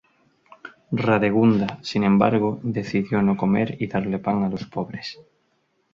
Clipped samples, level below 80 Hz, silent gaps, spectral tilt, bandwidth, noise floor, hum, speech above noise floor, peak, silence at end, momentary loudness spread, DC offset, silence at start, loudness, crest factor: under 0.1%; -56 dBFS; none; -8 dB/octave; 7.2 kHz; -68 dBFS; none; 47 dB; -4 dBFS; 0.7 s; 12 LU; under 0.1%; 0.65 s; -22 LUFS; 20 dB